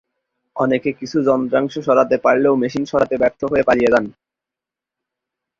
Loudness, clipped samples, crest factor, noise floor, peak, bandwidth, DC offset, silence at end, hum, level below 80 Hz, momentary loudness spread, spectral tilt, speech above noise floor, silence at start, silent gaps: -17 LUFS; under 0.1%; 16 dB; -87 dBFS; -2 dBFS; 7.6 kHz; under 0.1%; 1.5 s; none; -52 dBFS; 6 LU; -6.5 dB/octave; 70 dB; 0.55 s; none